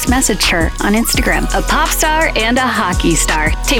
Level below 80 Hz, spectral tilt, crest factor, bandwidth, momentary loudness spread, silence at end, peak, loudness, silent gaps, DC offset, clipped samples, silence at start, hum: -20 dBFS; -3 dB/octave; 10 dB; 18.5 kHz; 2 LU; 0 s; -2 dBFS; -13 LUFS; none; 0.5%; under 0.1%; 0 s; none